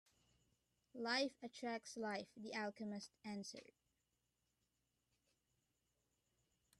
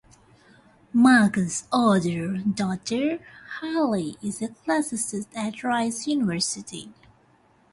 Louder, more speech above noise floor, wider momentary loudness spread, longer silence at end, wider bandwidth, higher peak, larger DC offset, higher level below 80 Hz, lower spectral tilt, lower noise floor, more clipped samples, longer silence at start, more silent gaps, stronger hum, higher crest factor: second, -47 LUFS vs -24 LUFS; first, 41 dB vs 36 dB; about the same, 11 LU vs 13 LU; first, 3.15 s vs 0.8 s; first, 13 kHz vs 11.5 kHz; second, -30 dBFS vs -6 dBFS; neither; second, -90 dBFS vs -62 dBFS; about the same, -3.5 dB/octave vs -4.5 dB/octave; first, -88 dBFS vs -60 dBFS; neither; about the same, 0.95 s vs 0.95 s; neither; neither; about the same, 22 dB vs 20 dB